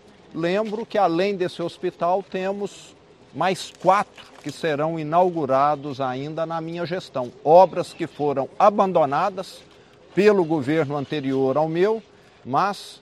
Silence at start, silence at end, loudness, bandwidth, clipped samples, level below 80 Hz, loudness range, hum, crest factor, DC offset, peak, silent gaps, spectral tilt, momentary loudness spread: 0.35 s; 0.05 s; -22 LUFS; 13 kHz; under 0.1%; -66 dBFS; 4 LU; none; 20 dB; under 0.1%; -2 dBFS; none; -6.5 dB/octave; 11 LU